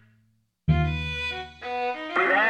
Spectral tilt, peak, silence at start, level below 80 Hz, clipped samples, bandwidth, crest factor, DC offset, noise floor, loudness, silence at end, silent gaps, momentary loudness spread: -6.5 dB/octave; -10 dBFS; 0.65 s; -40 dBFS; under 0.1%; 8.8 kHz; 18 dB; under 0.1%; -67 dBFS; -27 LUFS; 0 s; none; 8 LU